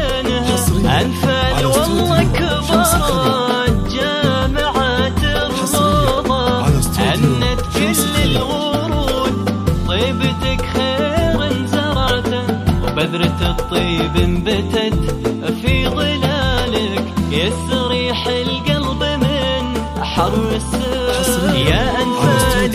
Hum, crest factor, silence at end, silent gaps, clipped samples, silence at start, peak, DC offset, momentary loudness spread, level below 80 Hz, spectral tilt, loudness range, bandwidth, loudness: none; 16 dB; 0 s; none; under 0.1%; 0 s; 0 dBFS; under 0.1%; 4 LU; -26 dBFS; -5 dB/octave; 2 LU; 16 kHz; -16 LUFS